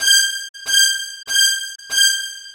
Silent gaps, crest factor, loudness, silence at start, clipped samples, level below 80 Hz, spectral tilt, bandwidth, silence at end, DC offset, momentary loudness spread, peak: 0.49-0.54 s; 16 dB; -15 LUFS; 0 s; under 0.1%; -68 dBFS; 5.5 dB/octave; over 20 kHz; 0 s; under 0.1%; 10 LU; -2 dBFS